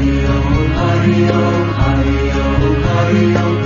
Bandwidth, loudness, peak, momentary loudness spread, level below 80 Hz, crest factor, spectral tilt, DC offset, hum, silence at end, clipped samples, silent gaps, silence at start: 7.2 kHz; -14 LUFS; 0 dBFS; 3 LU; -20 dBFS; 12 dB; -7.5 dB/octave; under 0.1%; none; 0 s; under 0.1%; none; 0 s